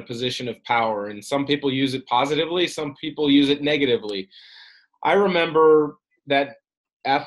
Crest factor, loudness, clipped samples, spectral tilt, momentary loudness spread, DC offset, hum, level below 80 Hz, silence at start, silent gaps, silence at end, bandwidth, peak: 16 dB; -21 LUFS; under 0.1%; -5 dB/octave; 12 LU; under 0.1%; none; -62 dBFS; 0 s; 6.77-6.84 s, 6.93-7.00 s; 0 s; 12 kHz; -6 dBFS